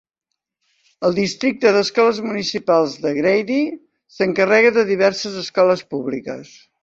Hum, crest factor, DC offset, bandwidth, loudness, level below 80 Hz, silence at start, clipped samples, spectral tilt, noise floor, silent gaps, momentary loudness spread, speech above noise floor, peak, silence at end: none; 16 dB; under 0.1%; 8 kHz; -18 LUFS; -62 dBFS; 1 s; under 0.1%; -4.5 dB/octave; -80 dBFS; none; 11 LU; 62 dB; -2 dBFS; 0.4 s